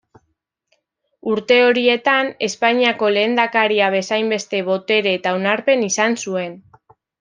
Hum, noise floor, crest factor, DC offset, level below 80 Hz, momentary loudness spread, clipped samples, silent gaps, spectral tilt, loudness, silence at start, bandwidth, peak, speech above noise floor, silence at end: none; -71 dBFS; 16 dB; under 0.1%; -70 dBFS; 9 LU; under 0.1%; none; -3 dB/octave; -17 LUFS; 1.25 s; 9.8 kHz; -2 dBFS; 54 dB; 0.6 s